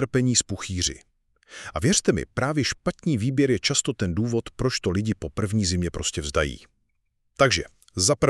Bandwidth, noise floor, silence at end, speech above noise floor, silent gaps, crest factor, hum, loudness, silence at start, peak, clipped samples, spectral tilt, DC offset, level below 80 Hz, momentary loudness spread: 13 kHz; -72 dBFS; 0 s; 48 dB; none; 20 dB; none; -24 LUFS; 0 s; -6 dBFS; under 0.1%; -4 dB/octave; under 0.1%; -44 dBFS; 9 LU